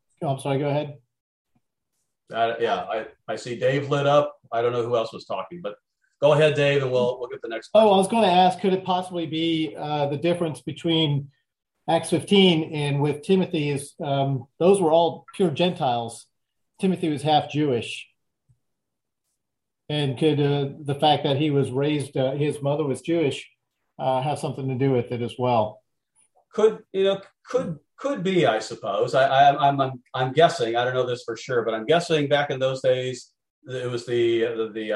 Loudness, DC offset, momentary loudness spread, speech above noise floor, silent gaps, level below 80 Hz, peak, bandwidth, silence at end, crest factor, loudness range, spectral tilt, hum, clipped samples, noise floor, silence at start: -23 LUFS; under 0.1%; 12 LU; 62 dB; 1.20-1.45 s, 33.50-33.62 s; -66 dBFS; -4 dBFS; 12 kHz; 0 s; 18 dB; 6 LU; -6 dB/octave; none; under 0.1%; -85 dBFS; 0.2 s